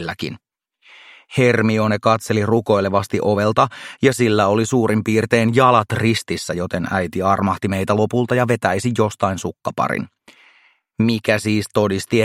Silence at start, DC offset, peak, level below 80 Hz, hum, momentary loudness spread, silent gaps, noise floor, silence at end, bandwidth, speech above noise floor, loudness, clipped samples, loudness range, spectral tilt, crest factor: 0 s; under 0.1%; 0 dBFS; -54 dBFS; none; 8 LU; none; -55 dBFS; 0 s; 15.5 kHz; 37 dB; -18 LUFS; under 0.1%; 4 LU; -6 dB/octave; 18 dB